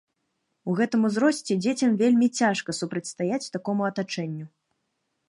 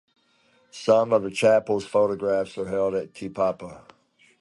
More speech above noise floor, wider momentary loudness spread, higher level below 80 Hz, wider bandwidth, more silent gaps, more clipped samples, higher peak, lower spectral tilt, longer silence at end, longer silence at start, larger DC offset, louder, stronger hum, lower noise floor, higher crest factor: first, 53 dB vs 40 dB; second, 11 LU vs 14 LU; second, -74 dBFS vs -62 dBFS; about the same, 11.5 kHz vs 11.5 kHz; neither; neither; second, -10 dBFS vs -6 dBFS; about the same, -5 dB/octave vs -5.5 dB/octave; first, 0.8 s vs 0.6 s; about the same, 0.65 s vs 0.75 s; neither; about the same, -25 LUFS vs -23 LUFS; neither; first, -77 dBFS vs -63 dBFS; about the same, 16 dB vs 18 dB